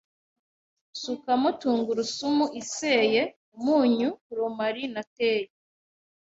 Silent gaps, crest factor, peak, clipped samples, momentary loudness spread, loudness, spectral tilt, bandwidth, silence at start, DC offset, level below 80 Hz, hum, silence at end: 3.36-3.52 s, 4.21-4.30 s, 5.07-5.16 s; 18 dB; -10 dBFS; under 0.1%; 11 LU; -26 LUFS; -3.5 dB/octave; 8 kHz; 0.95 s; under 0.1%; -70 dBFS; none; 0.75 s